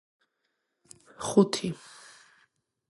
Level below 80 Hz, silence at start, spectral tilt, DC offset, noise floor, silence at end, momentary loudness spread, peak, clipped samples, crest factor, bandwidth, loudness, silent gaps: -70 dBFS; 1.2 s; -5.5 dB/octave; under 0.1%; -79 dBFS; 1.15 s; 25 LU; -8 dBFS; under 0.1%; 24 dB; 11.5 kHz; -27 LUFS; none